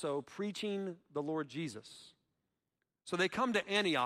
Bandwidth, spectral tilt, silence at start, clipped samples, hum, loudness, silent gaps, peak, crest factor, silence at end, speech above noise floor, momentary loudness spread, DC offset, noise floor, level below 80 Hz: 14.5 kHz; -4.5 dB/octave; 0 s; under 0.1%; none; -37 LUFS; none; -18 dBFS; 20 dB; 0 s; 52 dB; 19 LU; under 0.1%; -88 dBFS; -80 dBFS